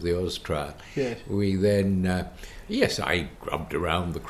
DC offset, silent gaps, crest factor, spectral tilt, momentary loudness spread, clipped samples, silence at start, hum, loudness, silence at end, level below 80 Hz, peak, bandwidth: under 0.1%; none; 20 dB; -6 dB/octave; 10 LU; under 0.1%; 0 s; none; -27 LUFS; 0 s; -42 dBFS; -8 dBFS; 14.5 kHz